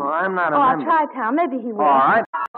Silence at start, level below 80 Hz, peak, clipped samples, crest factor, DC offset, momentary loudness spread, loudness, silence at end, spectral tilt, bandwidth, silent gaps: 0 s; -64 dBFS; -8 dBFS; under 0.1%; 10 dB; under 0.1%; 6 LU; -18 LUFS; 0 s; -3.5 dB/octave; 4.7 kHz; 2.26-2.33 s, 2.48-2.54 s